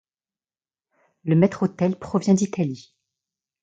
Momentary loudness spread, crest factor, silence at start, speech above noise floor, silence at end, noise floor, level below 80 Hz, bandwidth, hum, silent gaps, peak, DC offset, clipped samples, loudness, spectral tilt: 10 LU; 20 dB; 1.25 s; over 69 dB; 0.8 s; under -90 dBFS; -62 dBFS; 8 kHz; none; none; -4 dBFS; under 0.1%; under 0.1%; -22 LUFS; -7.5 dB/octave